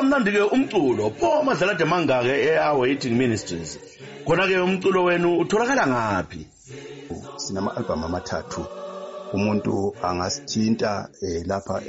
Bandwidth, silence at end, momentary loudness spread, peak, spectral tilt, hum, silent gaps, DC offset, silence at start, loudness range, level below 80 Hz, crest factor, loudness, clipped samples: 8 kHz; 0 s; 16 LU; -10 dBFS; -4.5 dB/octave; none; none; under 0.1%; 0 s; 7 LU; -52 dBFS; 12 dB; -22 LUFS; under 0.1%